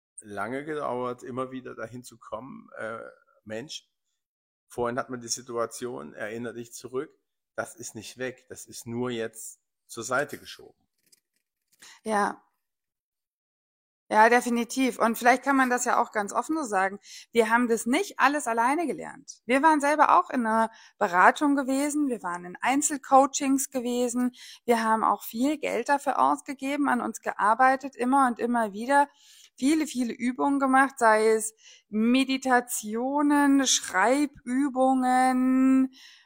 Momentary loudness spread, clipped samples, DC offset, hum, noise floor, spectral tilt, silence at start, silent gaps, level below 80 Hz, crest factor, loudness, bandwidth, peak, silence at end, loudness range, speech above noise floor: 18 LU; under 0.1%; under 0.1%; none; -87 dBFS; -3 dB/octave; 0.25 s; 4.26-4.67 s, 13.00-13.12 s, 13.27-14.07 s; -70 dBFS; 24 dB; -25 LUFS; 16.5 kHz; -2 dBFS; 0.4 s; 12 LU; 61 dB